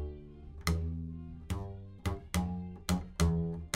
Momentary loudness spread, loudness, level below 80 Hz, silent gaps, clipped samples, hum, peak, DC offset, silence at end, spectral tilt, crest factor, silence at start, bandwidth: 14 LU; -36 LUFS; -44 dBFS; none; under 0.1%; none; -16 dBFS; under 0.1%; 0 s; -5.5 dB/octave; 20 dB; 0 s; 16 kHz